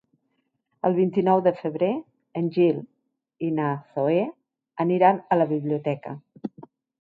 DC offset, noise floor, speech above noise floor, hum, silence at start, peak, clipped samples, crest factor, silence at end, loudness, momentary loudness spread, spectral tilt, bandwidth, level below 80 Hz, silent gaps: under 0.1%; -74 dBFS; 51 dB; none; 0.85 s; -6 dBFS; under 0.1%; 20 dB; 0.55 s; -24 LUFS; 16 LU; -10.5 dB/octave; 4.9 kHz; -74 dBFS; none